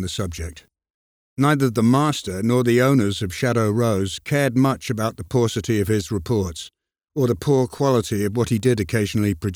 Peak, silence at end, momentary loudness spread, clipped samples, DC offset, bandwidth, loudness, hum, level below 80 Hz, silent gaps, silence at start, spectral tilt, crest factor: -4 dBFS; 0 s; 9 LU; under 0.1%; under 0.1%; 17.5 kHz; -21 LUFS; none; -46 dBFS; 0.90-1.36 s; 0 s; -6 dB/octave; 16 dB